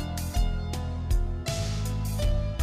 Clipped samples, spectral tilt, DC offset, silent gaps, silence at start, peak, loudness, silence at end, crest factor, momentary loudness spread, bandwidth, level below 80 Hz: under 0.1%; -5.5 dB/octave; under 0.1%; none; 0 s; -16 dBFS; -30 LUFS; 0 s; 12 dB; 4 LU; 15.5 kHz; -30 dBFS